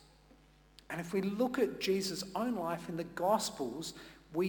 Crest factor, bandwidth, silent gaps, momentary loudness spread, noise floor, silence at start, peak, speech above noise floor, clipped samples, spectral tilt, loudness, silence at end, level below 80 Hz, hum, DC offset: 18 dB; 19 kHz; none; 11 LU; -63 dBFS; 0.9 s; -18 dBFS; 27 dB; under 0.1%; -4.5 dB/octave; -36 LUFS; 0 s; -66 dBFS; none; under 0.1%